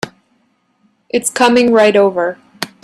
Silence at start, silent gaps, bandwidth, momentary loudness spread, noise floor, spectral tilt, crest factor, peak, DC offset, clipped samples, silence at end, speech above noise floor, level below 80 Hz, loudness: 0.05 s; none; 13.5 kHz; 16 LU; -60 dBFS; -3.5 dB/octave; 14 dB; 0 dBFS; under 0.1%; under 0.1%; 0.15 s; 48 dB; -58 dBFS; -12 LUFS